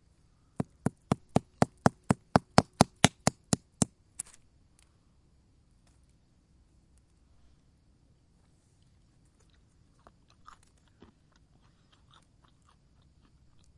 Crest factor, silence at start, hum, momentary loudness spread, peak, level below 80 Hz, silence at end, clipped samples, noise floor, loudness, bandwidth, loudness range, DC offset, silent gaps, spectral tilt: 34 dB; 0.6 s; none; 18 LU; 0 dBFS; -58 dBFS; 9.95 s; under 0.1%; -65 dBFS; -30 LUFS; 11.5 kHz; 13 LU; under 0.1%; none; -4.5 dB/octave